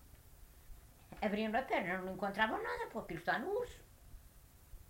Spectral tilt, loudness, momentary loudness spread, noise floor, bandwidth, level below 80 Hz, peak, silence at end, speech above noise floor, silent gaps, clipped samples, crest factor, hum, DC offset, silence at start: -5.5 dB/octave; -38 LUFS; 8 LU; -61 dBFS; 16 kHz; -60 dBFS; -18 dBFS; 0 s; 23 dB; none; under 0.1%; 24 dB; none; under 0.1%; 0 s